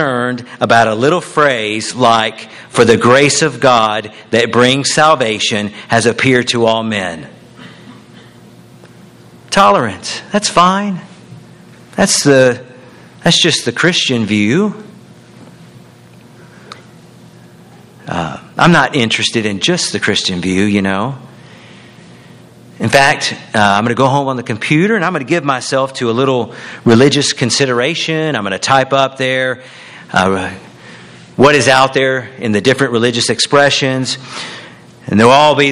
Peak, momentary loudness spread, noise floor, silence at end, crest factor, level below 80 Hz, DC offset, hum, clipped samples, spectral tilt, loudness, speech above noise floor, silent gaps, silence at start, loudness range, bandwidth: 0 dBFS; 12 LU; -40 dBFS; 0 s; 14 dB; -50 dBFS; under 0.1%; none; 0.2%; -4 dB/octave; -12 LUFS; 28 dB; none; 0 s; 6 LU; 14 kHz